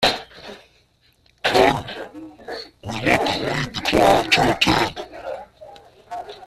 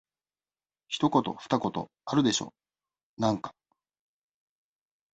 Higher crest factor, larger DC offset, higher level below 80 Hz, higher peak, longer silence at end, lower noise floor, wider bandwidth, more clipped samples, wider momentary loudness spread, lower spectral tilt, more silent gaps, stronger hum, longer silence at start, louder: about the same, 20 dB vs 22 dB; neither; first, -44 dBFS vs -66 dBFS; first, -2 dBFS vs -10 dBFS; second, 0 s vs 1.65 s; second, -59 dBFS vs under -90 dBFS; first, 14.5 kHz vs 8.4 kHz; neither; first, 20 LU vs 12 LU; about the same, -4 dB/octave vs -5 dB/octave; second, none vs 3.03-3.17 s; neither; second, 0 s vs 0.9 s; first, -19 LUFS vs -29 LUFS